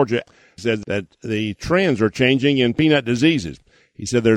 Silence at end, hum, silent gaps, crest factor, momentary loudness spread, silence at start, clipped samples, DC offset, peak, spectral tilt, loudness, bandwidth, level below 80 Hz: 0 s; none; none; 18 dB; 10 LU; 0 s; under 0.1%; under 0.1%; -2 dBFS; -5.5 dB/octave; -19 LUFS; 11.5 kHz; -48 dBFS